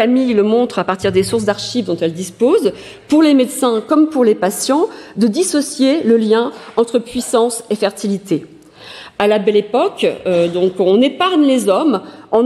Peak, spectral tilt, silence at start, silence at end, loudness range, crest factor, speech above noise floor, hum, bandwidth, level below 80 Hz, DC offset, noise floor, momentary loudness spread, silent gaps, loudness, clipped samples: -2 dBFS; -4.5 dB/octave; 0 s; 0 s; 3 LU; 12 dB; 22 dB; none; 14.5 kHz; -54 dBFS; under 0.1%; -36 dBFS; 7 LU; none; -15 LUFS; under 0.1%